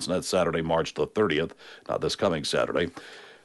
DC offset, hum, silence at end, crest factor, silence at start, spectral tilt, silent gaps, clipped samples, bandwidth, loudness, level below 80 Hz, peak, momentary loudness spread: under 0.1%; none; 0.1 s; 16 dB; 0 s; -4.5 dB/octave; none; under 0.1%; 11.5 kHz; -27 LUFS; -54 dBFS; -10 dBFS; 10 LU